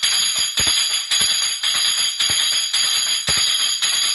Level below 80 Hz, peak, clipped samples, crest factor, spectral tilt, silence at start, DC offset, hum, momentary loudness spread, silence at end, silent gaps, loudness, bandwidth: -50 dBFS; -4 dBFS; under 0.1%; 14 dB; 2 dB/octave; 0 s; under 0.1%; none; 2 LU; 0 s; none; -16 LUFS; 12 kHz